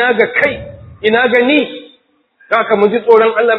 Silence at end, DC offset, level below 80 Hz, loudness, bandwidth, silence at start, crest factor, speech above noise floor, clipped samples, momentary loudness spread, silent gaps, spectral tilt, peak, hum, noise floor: 0 s; under 0.1%; -48 dBFS; -12 LUFS; 5.4 kHz; 0 s; 12 dB; 42 dB; 0.3%; 14 LU; none; -7.5 dB/octave; 0 dBFS; none; -53 dBFS